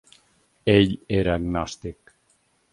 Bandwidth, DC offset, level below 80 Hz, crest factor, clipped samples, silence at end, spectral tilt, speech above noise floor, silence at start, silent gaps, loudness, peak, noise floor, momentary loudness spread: 11.5 kHz; under 0.1%; -42 dBFS; 22 dB; under 0.1%; 0.8 s; -6.5 dB/octave; 44 dB; 0.65 s; none; -23 LUFS; -2 dBFS; -65 dBFS; 16 LU